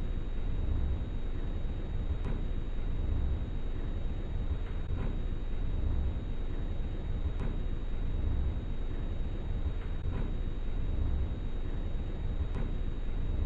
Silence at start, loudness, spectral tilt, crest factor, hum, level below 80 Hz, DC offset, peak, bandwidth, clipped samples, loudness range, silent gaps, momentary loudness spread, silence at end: 0 s; -38 LUFS; -9 dB/octave; 10 dB; none; -32 dBFS; under 0.1%; -20 dBFS; 4.4 kHz; under 0.1%; 1 LU; none; 4 LU; 0 s